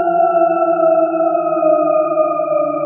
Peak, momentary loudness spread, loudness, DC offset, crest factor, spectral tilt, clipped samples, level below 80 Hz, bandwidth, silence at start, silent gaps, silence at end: -2 dBFS; 3 LU; -14 LUFS; under 0.1%; 12 dB; -7.5 dB/octave; under 0.1%; -86 dBFS; 3 kHz; 0 s; none; 0 s